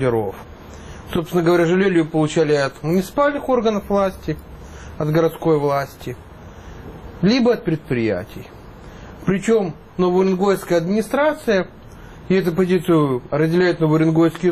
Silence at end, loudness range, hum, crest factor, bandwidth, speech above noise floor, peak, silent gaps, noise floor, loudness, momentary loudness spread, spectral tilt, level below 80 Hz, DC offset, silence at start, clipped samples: 0 s; 4 LU; none; 12 dB; 14.5 kHz; 21 dB; -6 dBFS; none; -38 dBFS; -19 LUFS; 21 LU; -7 dB/octave; -44 dBFS; under 0.1%; 0 s; under 0.1%